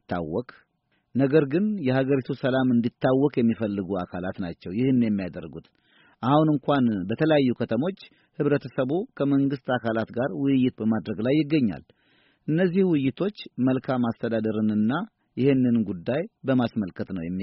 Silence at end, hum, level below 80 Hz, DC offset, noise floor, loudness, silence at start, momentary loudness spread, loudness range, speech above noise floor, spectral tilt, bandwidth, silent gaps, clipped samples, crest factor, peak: 0 s; none; -60 dBFS; under 0.1%; -63 dBFS; -25 LUFS; 0.1 s; 10 LU; 2 LU; 39 dB; -7 dB/octave; 5.8 kHz; none; under 0.1%; 18 dB; -6 dBFS